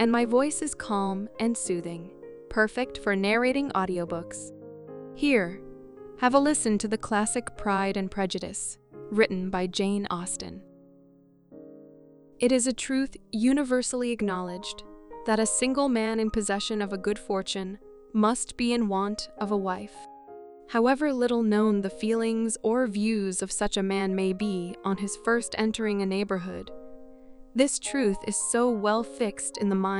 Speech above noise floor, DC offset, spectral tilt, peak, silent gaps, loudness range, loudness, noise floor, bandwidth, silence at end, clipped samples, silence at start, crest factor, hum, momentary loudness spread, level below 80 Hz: 31 dB; under 0.1%; -4 dB/octave; -8 dBFS; none; 3 LU; -27 LUFS; -58 dBFS; 12 kHz; 0 s; under 0.1%; 0 s; 20 dB; none; 16 LU; -52 dBFS